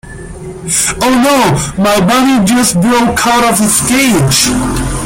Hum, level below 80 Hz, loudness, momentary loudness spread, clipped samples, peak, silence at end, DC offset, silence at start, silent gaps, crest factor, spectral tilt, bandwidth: none; -28 dBFS; -9 LUFS; 6 LU; under 0.1%; 0 dBFS; 0 s; under 0.1%; 0.05 s; none; 10 dB; -3.5 dB/octave; 16.5 kHz